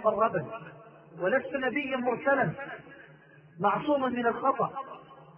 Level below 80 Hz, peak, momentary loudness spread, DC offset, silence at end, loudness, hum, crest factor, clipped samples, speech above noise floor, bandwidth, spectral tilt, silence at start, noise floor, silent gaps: -70 dBFS; -12 dBFS; 17 LU; under 0.1%; 0 s; -29 LUFS; none; 18 dB; under 0.1%; 26 dB; 5.2 kHz; -9.5 dB/octave; 0 s; -55 dBFS; none